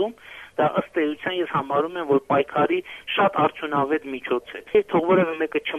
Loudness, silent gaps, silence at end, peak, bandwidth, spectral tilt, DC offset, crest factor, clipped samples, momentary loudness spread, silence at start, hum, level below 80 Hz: -23 LUFS; none; 0 s; -6 dBFS; 13 kHz; -7 dB/octave; under 0.1%; 18 dB; under 0.1%; 7 LU; 0 s; none; -62 dBFS